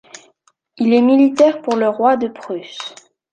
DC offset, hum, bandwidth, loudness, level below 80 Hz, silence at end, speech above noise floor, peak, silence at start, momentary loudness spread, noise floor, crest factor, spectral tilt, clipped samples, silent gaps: under 0.1%; none; 9.2 kHz; -15 LUFS; -66 dBFS; 0.45 s; 44 dB; -2 dBFS; 0.8 s; 17 LU; -59 dBFS; 14 dB; -5.5 dB/octave; under 0.1%; none